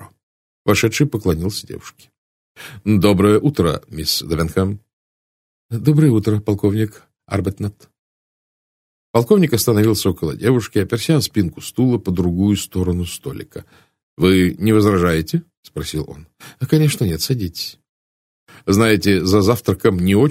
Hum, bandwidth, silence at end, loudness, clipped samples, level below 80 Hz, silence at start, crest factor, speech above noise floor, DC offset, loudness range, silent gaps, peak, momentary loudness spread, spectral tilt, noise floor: none; 16 kHz; 0 s; -17 LUFS; under 0.1%; -42 dBFS; 0 s; 18 dB; over 73 dB; under 0.1%; 3 LU; 0.23-0.65 s, 2.18-2.55 s, 4.93-5.69 s, 7.99-9.14 s, 14.03-14.17 s, 15.57-15.63 s, 17.89-18.47 s; 0 dBFS; 15 LU; -6 dB/octave; under -90 dBFS